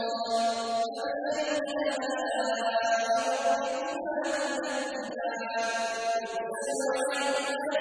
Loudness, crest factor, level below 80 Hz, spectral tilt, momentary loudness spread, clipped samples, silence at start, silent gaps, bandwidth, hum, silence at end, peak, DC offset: -30 LUFS; 14 dB; -74 dBFS; -1.5 dB/octave; 5 LU; under 0.1%; 0 s; none; 11 kHz; none; 0 s; -16 dBFS; under 0.1%